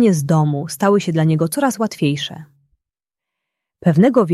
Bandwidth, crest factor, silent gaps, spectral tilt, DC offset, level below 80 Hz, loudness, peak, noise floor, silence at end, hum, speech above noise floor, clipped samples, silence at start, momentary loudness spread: 14.5 kHz; 16 dB; none; -6.5 dB/octave; under 0.1%; -58 dBFS; -17 LUFS; -2 dBFS; -86 dBFS; 0 s; none; 71 dB; under 0.1%; 0 s; 7 LU